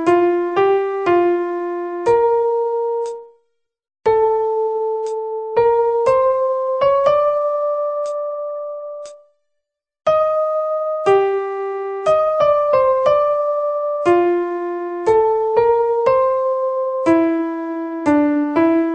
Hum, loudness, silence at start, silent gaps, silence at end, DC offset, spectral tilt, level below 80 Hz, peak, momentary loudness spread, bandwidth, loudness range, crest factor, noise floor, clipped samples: none; -17 LUFS; 0 s; none; 0 s; under 0.1%; -6.5 dB/octave; -54 dBFS; -2 dBFS; 9 LU; 8.8 kHz; 4 LU; 14 dB; -77 dBFS; under 0.1%